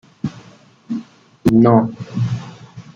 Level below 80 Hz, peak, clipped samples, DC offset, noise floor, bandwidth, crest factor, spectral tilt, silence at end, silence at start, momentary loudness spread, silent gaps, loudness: -48 dBFS; -2 dBFS; under 0.1%; under 0.1%; -46 dBFS; 11.5 kHz; 16 dB; -9 dB/octave; 0.15 s; 0.25 s; 17 LU; none; -18 LUFS